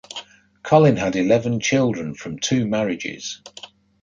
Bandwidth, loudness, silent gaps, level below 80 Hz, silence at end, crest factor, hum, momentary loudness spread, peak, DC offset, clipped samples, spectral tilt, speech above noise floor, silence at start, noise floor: 7.8 kHz; -20 LUFS; none; -54 dBFS; 0.35 s; 18 dB; none; 20 LU; -2 dBFS; under 0.1%; under 0.1%; -5.5 dB/octave; 20 dB; 0.1 s; -40 dBFS